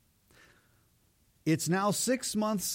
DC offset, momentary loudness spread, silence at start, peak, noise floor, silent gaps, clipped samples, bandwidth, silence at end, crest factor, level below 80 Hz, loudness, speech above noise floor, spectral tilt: under 0.1%; 3 LU; 1.45 s; -16 dBFS; -68 dBFS; none; under 0.1%; 16.5 kHz; 0 s; 16 dB; -68 dBFS; -30 LUFS; 39 dB; -4 dB/octave